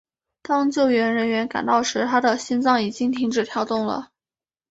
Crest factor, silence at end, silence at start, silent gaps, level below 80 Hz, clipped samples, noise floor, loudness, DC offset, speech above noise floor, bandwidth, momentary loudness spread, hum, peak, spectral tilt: 18 dB; 0.65 s; 0.5 s; none; -64 dBFS; under 0.1%; under -90 dBFS; -21 LUFS; under 0.1%; over 69 dB; 8 kHz; 5 LU; none; -4 dBFS; -4 dB/octave